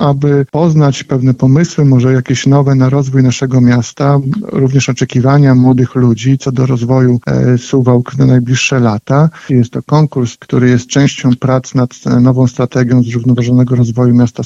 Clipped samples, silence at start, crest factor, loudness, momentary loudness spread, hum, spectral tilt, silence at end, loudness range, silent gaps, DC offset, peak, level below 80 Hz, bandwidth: under 0.1%; 0 s; 10 dB; -10 LUFS; 4 LU; none; -7 dB/octave; 0 s; 1 LU; none; under 0.1%; 0 dBFS; -42 dBFS; 7.8 kHz